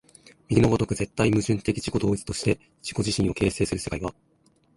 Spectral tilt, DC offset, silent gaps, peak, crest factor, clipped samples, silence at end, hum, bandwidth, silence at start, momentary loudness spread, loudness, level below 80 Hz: -5.5 dB/octave; under 0.1%; none; -4 dBFS; 20 dB; under 0.1%; 0.65 s; none; 11.5 kHz; 0.5 s; 8 LU; -25 LUFS; -44 dBFS